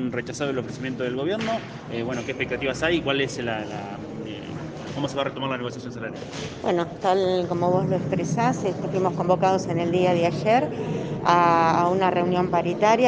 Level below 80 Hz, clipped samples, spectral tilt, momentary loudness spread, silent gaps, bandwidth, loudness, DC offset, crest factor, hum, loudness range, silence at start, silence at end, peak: -56 dBFS; under 0.1%; -6 dB/octave; 13 LU; none; 9.6 kHz; -24 LUFS; under 0.1%; 20 dB; none; 8 LU; 0 s; 0 s; -4 dBFS